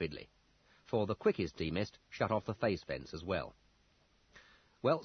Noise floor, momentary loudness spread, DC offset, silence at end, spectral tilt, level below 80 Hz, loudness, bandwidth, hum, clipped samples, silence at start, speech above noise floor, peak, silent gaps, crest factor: -71 dBFS; 9 LU; under 0.1%; 0 s; -5 dB/octave; -64 dBFS; -37 LUFS; 6.4 kHz; none; under 0.1%; 0 s; 34 dB; -18 dBFS; none; 20 dB